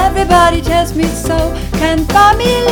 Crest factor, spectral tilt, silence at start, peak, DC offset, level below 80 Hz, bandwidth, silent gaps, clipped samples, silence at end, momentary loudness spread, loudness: 10 dB; -5 dB/octave; 0 s; 0 dBFS; under 0.1%; -20 dBFS; 19.5 kHz; none; 0.6%; 0 s; 7 LU; -11 LUFS